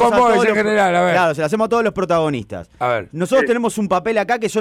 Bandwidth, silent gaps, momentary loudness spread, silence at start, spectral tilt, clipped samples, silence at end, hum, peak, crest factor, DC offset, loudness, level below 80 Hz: 16 kHz; none; 8 LU; 0 s; -5 dB/octave; under 0.1%; 0 s; none; -6 dBFS; 10 dB; under 0.1%; -17 LUFS; -50 dBFS